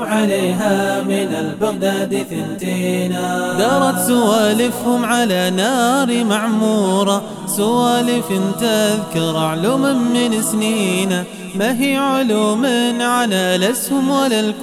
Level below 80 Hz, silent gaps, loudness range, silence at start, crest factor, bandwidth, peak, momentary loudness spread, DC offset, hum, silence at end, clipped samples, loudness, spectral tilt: -60 dBFS; none; 3 LU; 0 s; 14 dB; 17 kHz; -2 dBFS; 5 LU; under 0.1%; none; 0 s; under 0.1%; -16 LUFS; -4.5 dB/octave